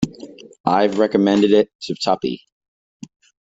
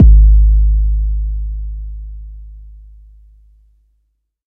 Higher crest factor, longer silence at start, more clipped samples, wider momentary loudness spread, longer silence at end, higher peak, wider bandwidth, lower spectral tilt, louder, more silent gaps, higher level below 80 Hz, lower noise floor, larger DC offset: about the same, 16 dB vs 12 dB; about the same, 0 s vs 0 s; neither; second, 17 LU vs 25 LU; second, 1.05 s vs 1.85 s; about the same, -2 dBFS vs 0 dBFS; first, 8 kHz vs 0.5 kHz; second, -6 dB/octave vs -14 dB/octave; second, -18 LUFS vs -14 LUFS; first, 0.60-0.64 s, 1.75-1.79 s vs none; second, -56 dBFS vs -12 dBFS; second, -39 dBFS vs -65 dBFS; neither